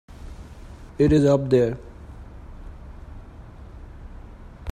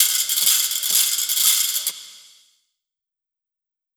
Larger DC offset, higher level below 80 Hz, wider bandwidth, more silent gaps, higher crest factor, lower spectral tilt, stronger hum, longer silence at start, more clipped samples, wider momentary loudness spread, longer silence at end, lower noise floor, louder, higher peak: neither; first, -40 dBFS vs -76 dBFS; second, 10 kHz vs over 20 kHz; neither; about the same, 20 dB vs 20 dB; first, -8 dB/octave vs 5 dB/octave; neither; first, 0.2 s vs 0 s; neither; first, 26 LU vs 8 LU; second, 0 s vs 1.75 s; second, -42 dBFS vs -87 dBFS; second, -20 LUFS vs -17 LUFS; second, -6 dBFS vs -2 dBFS